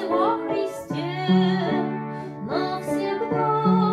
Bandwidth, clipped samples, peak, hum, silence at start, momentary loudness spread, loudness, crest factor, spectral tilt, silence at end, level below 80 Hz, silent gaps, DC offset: 13.5 kHz; under 0.1%; -8 dBFS; none; 0 s; 9 LU; -24 LUFS; 14 dB; -7.5 dB/octave; 0 s; -62 dBFS; none; under 0.1%